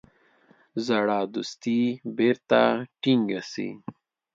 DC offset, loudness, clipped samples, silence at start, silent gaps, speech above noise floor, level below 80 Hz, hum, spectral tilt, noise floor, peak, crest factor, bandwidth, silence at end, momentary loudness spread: under 0.1%; -25 LUFS; under 0.1%; 0.75 s; none; 36 dB; -72 dBFS; none; -5.5 dB/octave; -60 dBFS; -6 dBFS; 20 dB; 7.6 kHz; 0.45 s; 14 LU